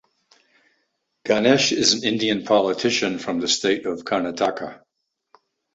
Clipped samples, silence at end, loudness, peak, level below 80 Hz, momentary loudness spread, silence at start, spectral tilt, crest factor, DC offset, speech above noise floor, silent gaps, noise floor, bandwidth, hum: under 0.1%; 1 s; -20 LUFS; -2 dBFS; -62 dBFS; 8 LU; 1.25 s; -3 dB/octave; 20 dB; under 0.1%; 52 dB; none; -72 dBFS; 8.2 kHz; none